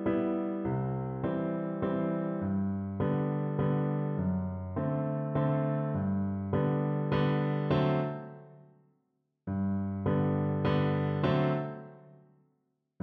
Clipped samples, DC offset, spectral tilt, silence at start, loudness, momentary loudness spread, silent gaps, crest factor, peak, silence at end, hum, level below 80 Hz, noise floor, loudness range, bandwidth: under 0.1%; under 0.1%; -10.5 dB/octave; 0 s; -31 LUFS; 6 LU; none; 16 dB; -16 dBFS; 0.85 s; none; -58 dBFS; -78 dBFS; 2 LU; 4.9 kHz